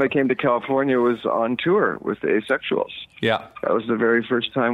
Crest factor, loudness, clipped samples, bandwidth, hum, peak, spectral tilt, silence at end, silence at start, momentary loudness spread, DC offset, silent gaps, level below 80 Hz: 16 dB; -21 LUFS; under 0.1%; 10.5 kHz; none; -6 dBFS; -7 dB/octave; 0 s; 0 s; 5 LU; under 0.1%; none; -62 dBFS